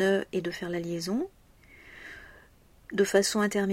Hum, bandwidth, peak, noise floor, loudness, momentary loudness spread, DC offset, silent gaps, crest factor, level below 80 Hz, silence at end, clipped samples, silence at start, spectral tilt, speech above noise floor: none; 16 kHz; -10 dBFS; -58 dBFS; -29 LUFS; 21 LU; under 0.1%; none; 20 dB; -60 dBFS; 0 s; under 0.1%; 0 s; -4.5 dB/octave; 30 dB